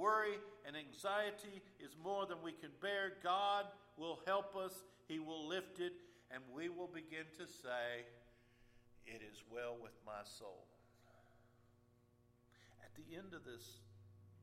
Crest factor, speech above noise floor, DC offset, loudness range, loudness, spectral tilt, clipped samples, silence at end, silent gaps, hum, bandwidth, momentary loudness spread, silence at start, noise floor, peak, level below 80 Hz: 20 dB; 27 dB; under 0.1%; 17 LU; -46 LUFS; -4 dB/octave; under 0.1%; 0 s; none; 60 Hz at -75 dBFS; 16 kHz; 19 LU; 0 s; -73 dBFS; -26 dBFS; -80 dBFS